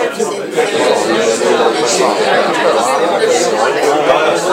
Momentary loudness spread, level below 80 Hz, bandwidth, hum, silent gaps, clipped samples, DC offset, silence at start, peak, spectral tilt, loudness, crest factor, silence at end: 3 LU; -58 dBFS; 16 kHz; none; none; under 0.1%; under 0.1%; 0 s; 0 dBFS; -2.5 dB/octave; -12 LUFS; 12 dB; 0 s